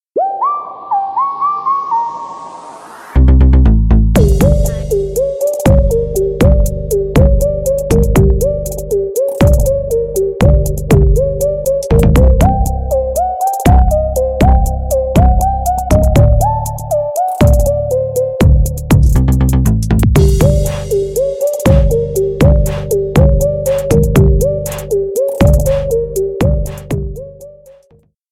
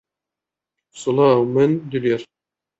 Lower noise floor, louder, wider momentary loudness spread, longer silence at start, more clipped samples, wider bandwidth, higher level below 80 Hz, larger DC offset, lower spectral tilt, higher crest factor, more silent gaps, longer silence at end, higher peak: second, -50 dBFS vs -87 dBFS; first, -13 LUFS vs -19 LUFS; about the same, 7 LU vs 9 LU; second, 0.15 s vs 0.95 s; neither; first, 16 kHz vs 8.2 kHz; first, -14 dBFS vs -64 dBFS; neither; about the same, -7.5 dB/octave vs -7 dB/octave; second, 10 dB vs 18 dB; neither; first, 0.8 s vs 0.55 s; about the same, 0 dBFS vs -2 dBFS